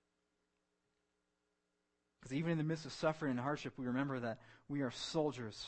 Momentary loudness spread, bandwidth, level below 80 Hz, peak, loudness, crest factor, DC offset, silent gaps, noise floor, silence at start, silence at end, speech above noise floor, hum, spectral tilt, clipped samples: 7 LU; 8.4 kHz; -72 dBFS; -22 dBFS; -40 LUFS; 20 dB; under 0.1%; none; -85 dBFS; 2.2 s; 0 s; 45 dB; none; -6 dB/octave; under 0.1%